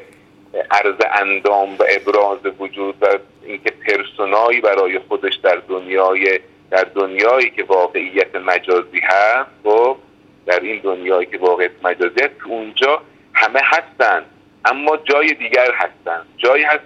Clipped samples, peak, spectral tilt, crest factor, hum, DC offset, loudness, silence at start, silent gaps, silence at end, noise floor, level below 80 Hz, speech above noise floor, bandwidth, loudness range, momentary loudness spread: under 0.1%; 0 dBFS; -3 dB/octave; 16 dB; none; under 0.1%; -16 LUFS; 0 s; none; 0.05 s; -46 dBFS; -66 dBFS; 30 dB; 7.8 kHz; 2 LU; 8 LU